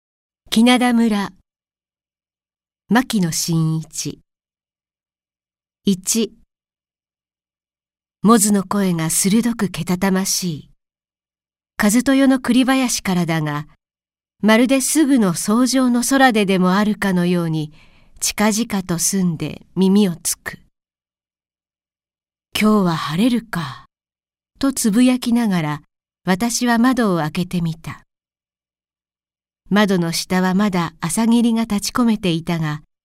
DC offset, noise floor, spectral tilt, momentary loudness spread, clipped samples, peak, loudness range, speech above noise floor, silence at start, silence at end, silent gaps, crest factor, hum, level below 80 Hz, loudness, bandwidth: under 0.1%; under -90 dBFS; -4.5 dB/octave; 12 LU; under 0.1%; 0 dBFS; 6 LU; over 73 dB; 0.5 s; 0.25 s; none; 18 dB; none; -50 dBFS; -17 LUFS; 16 kHz